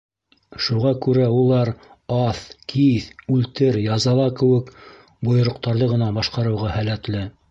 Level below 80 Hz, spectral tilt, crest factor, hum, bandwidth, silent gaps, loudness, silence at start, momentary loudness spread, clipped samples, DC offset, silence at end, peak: -46 dBFS; -7 dB/octave; 14 dB; none; 7.8 kHz; none; -20 LUFS; 0.55 s; 9 LU; under 0.1%; under 0.1%; 0.2 s; -6 dBFS